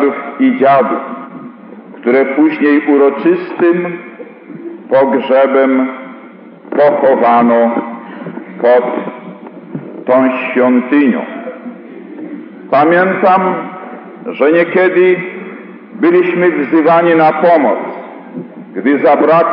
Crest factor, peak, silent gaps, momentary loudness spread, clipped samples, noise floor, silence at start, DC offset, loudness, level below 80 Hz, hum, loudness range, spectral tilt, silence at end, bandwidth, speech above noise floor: 10 dB; 0 dBFS; none; 20 LU; under 0.1%; -34 dBFS; 0 s; under 0.1%; -11 LUFS; -80 dBFS; none; 3 LU; -5 dB/octave; 0 s; 5.2 kHz; 25 dB